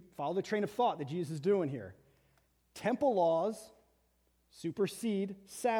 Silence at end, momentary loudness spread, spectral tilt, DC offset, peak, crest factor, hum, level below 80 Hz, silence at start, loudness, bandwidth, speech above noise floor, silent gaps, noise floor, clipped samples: 0 s; 13 LU; -6 dB/octave; under 0.1%; -18 dBFS; 16 dB; none; -74 dBFS; 0.2 s; -34 LUFS; 18 kHz; 40 dB; none; -74 dBFS; under 0.1%